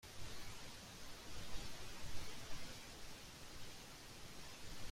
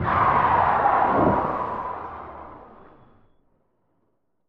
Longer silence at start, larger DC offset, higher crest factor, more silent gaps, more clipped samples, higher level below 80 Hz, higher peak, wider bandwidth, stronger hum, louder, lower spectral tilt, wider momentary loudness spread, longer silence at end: about the same, 0.05 s vs 0 s; neither; about the same, 16 dB vs 18 dB; neither; neither; second, -58 dBFS vs -46 dBFS; second, -30 dBFS vs -6 dBFS; first, 16 kHz vs 6 kHz; neither; second, -53 LUFS vs -21 LUFS; second, -2.5 dB/octave vs -9 dB/octave; second, 3 LU vs 20 LU; second, 0 s vs 1.75 s